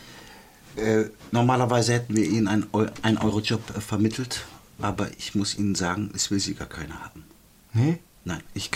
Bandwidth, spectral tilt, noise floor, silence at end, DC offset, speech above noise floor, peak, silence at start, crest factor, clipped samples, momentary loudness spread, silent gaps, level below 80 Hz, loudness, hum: 16 kHz; -5 dB/octave; -48 dBFS; 0 s; under 0.1%; 23 dB; -6 dBFS; 0 s; 20 dB; under 0.1%; 14 LU; none; -52 dBFS; -25 LUFS; none